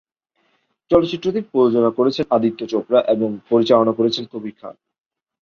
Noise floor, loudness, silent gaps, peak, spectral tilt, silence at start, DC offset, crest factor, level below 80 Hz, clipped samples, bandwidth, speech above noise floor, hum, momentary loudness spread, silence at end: -67 dBFS; -18 LUFS; none; -2 dBFS; -7 dB/octave; 0.9 s; under 0.1%; 18 dB; -56 dBFS; under 0.1%; 7 kHz; 49 dB; none; 15 LU; 0.7 s